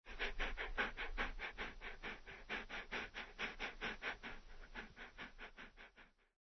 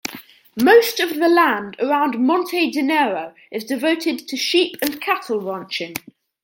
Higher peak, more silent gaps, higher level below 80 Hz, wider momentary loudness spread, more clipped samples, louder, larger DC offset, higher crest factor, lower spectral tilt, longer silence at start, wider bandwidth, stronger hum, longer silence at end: second, -26 dBFS vs -2 dBFS; neither; first, -54 dBFS vs -66 dBFS; second, 13 LU vs 16 LU; neither; second, -47 LUFS vs -18 LUFS; neither; about the same, 22 dB vs 18 dB; second, -0.5 dB/octave vs -3 dB/octave; about the same, 0.05 s vs 0.05 s; second, 6.2 kHz vs 17 kHz; neither; second, 0.3 s vs 0.45 s